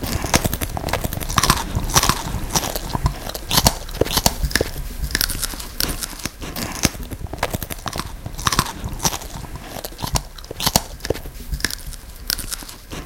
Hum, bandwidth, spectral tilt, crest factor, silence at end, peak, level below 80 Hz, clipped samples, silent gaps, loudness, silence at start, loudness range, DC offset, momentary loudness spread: none; 17 kHz; -3 dB/octave; 22 dB; 0 s; 0 dBFS; -30 dBFS; under 0.1%; none; -22 LUFS; 0 s; 5 LU; under 0.1%; 14 LU